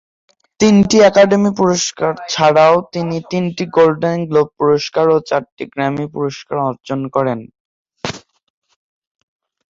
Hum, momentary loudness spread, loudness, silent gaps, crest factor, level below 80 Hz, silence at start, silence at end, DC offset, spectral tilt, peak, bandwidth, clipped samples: none; 13 LU; -14 LUFS; 5.52-5.57 s, 7.60-7.85 s; 14 dB; -52 dBFS; 0.6 s; 1.55 s; under 0.1%; -5 dB/octave; 0 dBFS; 7.8 kHz; under 0.1%